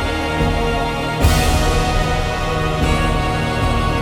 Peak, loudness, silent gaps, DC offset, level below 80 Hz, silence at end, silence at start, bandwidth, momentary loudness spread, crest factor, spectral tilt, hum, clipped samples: -2 dBFS; -18 LUFS; none; under 0.1%; -22 dBFS; 0 s; 0 s; 18 kHz; 4 LU; 16 dB; -5 dB/octave; none; under 0.1%